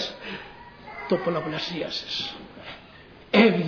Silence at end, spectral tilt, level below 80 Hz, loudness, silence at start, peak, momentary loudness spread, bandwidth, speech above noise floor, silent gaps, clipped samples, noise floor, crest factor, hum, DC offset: 0 s; -6 dB/octave; -58 dBFS; -26 LUFS; 0 s; -4 dBFS; 22 LU; 5.4 kHz; 20 dB; none; under 0.1%; -48 dBFS; 22 dB; none; under 0.1%